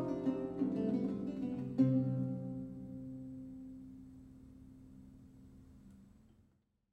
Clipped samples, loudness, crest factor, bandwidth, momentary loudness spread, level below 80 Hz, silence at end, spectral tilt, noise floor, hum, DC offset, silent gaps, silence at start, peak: under 0.1%; -38 LUFS; 20 dB; 6 kHz; 26 LU; -66 dBFS; 0.85 s; -10.5 dB/octave; -75 dBFS; none; under 0.1%; none; 0 s; -18 dBFS